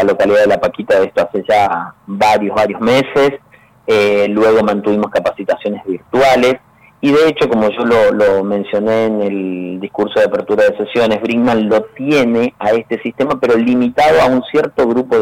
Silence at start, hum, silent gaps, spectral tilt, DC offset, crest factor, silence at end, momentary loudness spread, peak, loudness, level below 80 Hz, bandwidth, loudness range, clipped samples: 0 s; none; none; -6 dB/octave; under 0.1%; 8 dB; 0 s; 8 LU; -6 dBFS; -13 LUFS; -48 dBFS; 15.5 kHz; 1 LU; under 0.1%